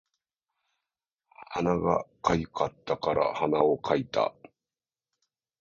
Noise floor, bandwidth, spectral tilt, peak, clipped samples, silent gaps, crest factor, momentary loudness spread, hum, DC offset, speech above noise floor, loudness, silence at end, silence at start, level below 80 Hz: under -90 dBFS; 7.4 kHz; -6.5 dB/octave; -6 dBFS; under 0.1%; none; 24 dB; 7 LU; none; under 0.1%; over 63 dB; -28 LUFS; 1.3 s; 1.4 s; -56 dBFS